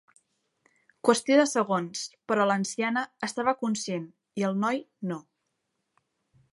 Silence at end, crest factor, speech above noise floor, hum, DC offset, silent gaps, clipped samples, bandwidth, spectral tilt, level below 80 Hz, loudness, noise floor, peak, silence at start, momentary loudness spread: 1.35 s; 24 dB; 53 dB; none; under 0.1%; none; under 0.1%; 11.5 kHz; -4.5 dB/octave; -78 dBFS; -27 LUFS; -80 dBFS; -6 dBFS; 1.05 s; 13 LU